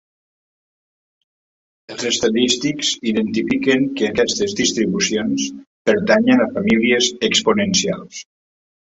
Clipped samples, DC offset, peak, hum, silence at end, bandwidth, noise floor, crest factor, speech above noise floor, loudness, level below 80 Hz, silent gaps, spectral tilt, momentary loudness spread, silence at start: under 0.1%; under 0.1%; -2 dBFS; none; 0.75 s; 8.4 kHz; under -90 dBFS; 18 dB; over 73 dB; -17 LUFS; -54 dBFS; 5.67-5.85 s; -3.5 dB/octave; 9 LU; 1.9 s